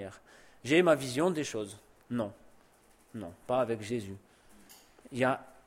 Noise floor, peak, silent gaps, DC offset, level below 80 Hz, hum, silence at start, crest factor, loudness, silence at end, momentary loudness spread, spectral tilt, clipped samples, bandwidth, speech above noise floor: -63 dBFS; -12 dBFS; none; under 0.1%; -68 dBFS; none; 0 s; 22 dB; -31 LUFS; 0.15 s; 20 LU; -5 dB/octave; under 0.1%; 16.5 kHz; 32 dB